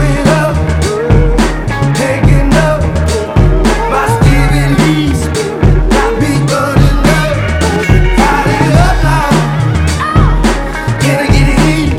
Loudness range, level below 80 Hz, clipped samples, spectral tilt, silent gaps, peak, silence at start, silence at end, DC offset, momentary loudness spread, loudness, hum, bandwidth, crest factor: 1 LU; -14 dBFS; 0.7%; -6 dB/octave; none; 0 dBFS; 0 s; 0 s; under 0.1%; 4 LU; -10 LUFS; none; 14.5 kHz; 8 dB